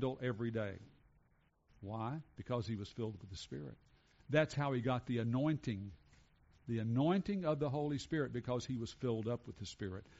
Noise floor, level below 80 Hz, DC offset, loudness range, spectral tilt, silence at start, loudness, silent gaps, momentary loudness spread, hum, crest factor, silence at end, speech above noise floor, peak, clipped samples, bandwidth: -74 dBFS; -66 dBFS; under 0.1%; 7 LU; -6.5 dB/octave; 0 s; -40 LUFS; none; 13 LU; none; 20 dB; 0.15 s; 35 dB; -20 dBFS; under 0.1%; 7.6 kHz